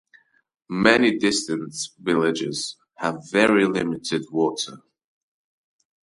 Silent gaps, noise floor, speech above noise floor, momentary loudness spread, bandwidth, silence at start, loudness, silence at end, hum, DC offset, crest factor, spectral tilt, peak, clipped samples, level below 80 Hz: none; -58 dBFS; 36 dB; 13 LU; 11.5 kHz; 0.7 s; -22 LUFS; 1.25 s; none; under 0.1%; 24 dB; -4 dB/octave; 0 dBFS; under 0.1%; -60 dBFS